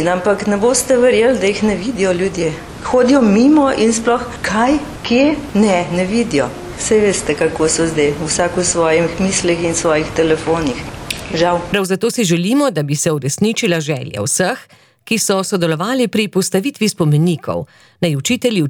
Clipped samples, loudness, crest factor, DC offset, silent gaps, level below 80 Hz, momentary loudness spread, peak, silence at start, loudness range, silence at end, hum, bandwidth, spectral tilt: under 0.1%; -15 LUFS; 12 dB; under 0.1%; none; -40 dBFS; 8 LU; -2 dBFS; 0 s; 3 LU; 0 s; none; 19.5 kHz; -4.5 dB/octave